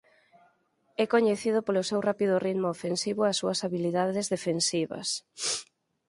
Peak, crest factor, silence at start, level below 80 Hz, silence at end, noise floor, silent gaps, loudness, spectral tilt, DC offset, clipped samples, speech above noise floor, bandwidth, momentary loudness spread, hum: -10 dBFS; 18 dB; 1 s; -74 dBFS; 0.45 s; -69 dBFS; none; -28 LUFS; -4 dB/octave; under 0.1%; under 0.1%; 41 dB; 11.5 kHz; 6 LU; none